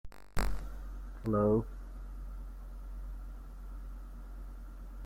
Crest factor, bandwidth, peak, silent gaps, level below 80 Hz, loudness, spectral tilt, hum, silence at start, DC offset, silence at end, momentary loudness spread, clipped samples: 18 dB; 16 kHz; -18 dBFS; none; -42 dBFS; -38 LUFS; -7.5 dB/octave; none; 0.05 s; under 0.1%; 0 s; 19 LU; under 0.1%